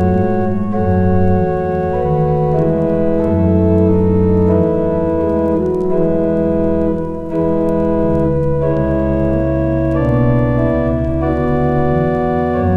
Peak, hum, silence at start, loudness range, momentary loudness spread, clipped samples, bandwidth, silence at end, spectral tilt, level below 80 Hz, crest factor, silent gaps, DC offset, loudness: -2 dBFS; none; 0 s; 2 LU; 4 LU; under 0.1%; 4.9 kHz; 0 s; -11 dB/octave; -28 dBFS; 12 dB; none; under 0.1%; -15 LUFS